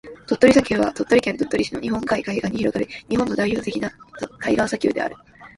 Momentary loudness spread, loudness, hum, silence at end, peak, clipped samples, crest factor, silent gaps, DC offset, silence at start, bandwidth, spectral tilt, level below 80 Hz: 12 LU; -21 LUFS; none; 0.1 s; 0 dBFS; under 0.1%; 20 dB; none; under 0.1%; 0.05 s; 11.5 kHz; -5.5 dB/octave; -48 dBFS